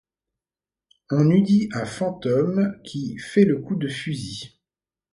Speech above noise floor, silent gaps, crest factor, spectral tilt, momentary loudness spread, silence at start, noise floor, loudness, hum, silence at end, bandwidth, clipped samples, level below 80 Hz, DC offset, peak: over 69 dB; none; 18 dB; -7 dB/octave; 13 LU; 1.1 s; under -90 dBFS; -22 LUFS; none; 0.65 s; 11 kHz; under 0.1%; -60 dBFS; under 0.1%; -4 dBFS